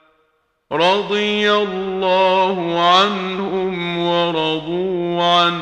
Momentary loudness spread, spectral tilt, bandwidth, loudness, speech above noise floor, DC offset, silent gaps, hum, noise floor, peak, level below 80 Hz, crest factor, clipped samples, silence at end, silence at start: 8 LU; -5 dB/octave; 9.6 kHz; -17 LUFS; 47 dB; under 0.1%; none; none; -64 dBFS; 0 dBFS; -56 dBFS; 16 dB; under 0.1%; 0 s; 0.7 s